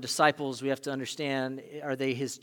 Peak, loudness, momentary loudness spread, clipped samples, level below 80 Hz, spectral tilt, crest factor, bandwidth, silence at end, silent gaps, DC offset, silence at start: -8 dBFS; -31 LUFS; 11 LU; under 0.1%; -82 dBFS; -4 dB/octave; 24 dB; 18.5 kHz; 0.05 s; none; under 0.1%; 0 s